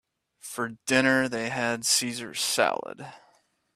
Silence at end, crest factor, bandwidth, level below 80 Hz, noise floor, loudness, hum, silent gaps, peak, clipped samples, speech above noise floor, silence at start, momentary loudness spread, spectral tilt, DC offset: 0.55 s; 22 dB; 16 kHz; -70 dBFS; -66 dBFS; -25 LUFS; none; none; -6 dBFS; under 0.1%; 39 dB; 0.45 s; 19 LU; -2.5 dB/octave; under 0.1%